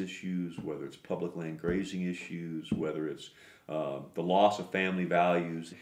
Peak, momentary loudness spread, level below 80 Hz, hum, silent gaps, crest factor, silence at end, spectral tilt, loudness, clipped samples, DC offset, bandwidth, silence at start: -10 dBFS; 12 LU; -62 dBFS; none; none; 22 dB; 0 s; -6.5 dB/octave; -33 LUFS; under 0.1%; under 0.1%; 13.5 kHz; 0 s